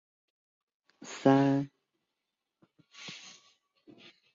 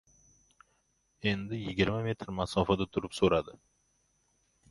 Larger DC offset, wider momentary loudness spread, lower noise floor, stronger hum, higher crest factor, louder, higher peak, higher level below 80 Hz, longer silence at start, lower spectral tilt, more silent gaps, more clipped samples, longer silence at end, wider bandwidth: neither; first, 25 LU vs 7 LU; first, -87 dBFS vs -74 dBFS; neither; about the same, 24 dB vs 24 dB; first, -27 LUFS vs -31 LUFS; about the same, -10 dBFS vs -10 dBFS; second, -76 dBFS vs -52 dBFS; second, 1.05 s vs 1.25 s; about the same, -6.5 dB/octave vs -6 dB/octave; neither; neither; about the same, 1.15 s vs 1.2 s; second, 7.6 kHz vs 11.5 kHz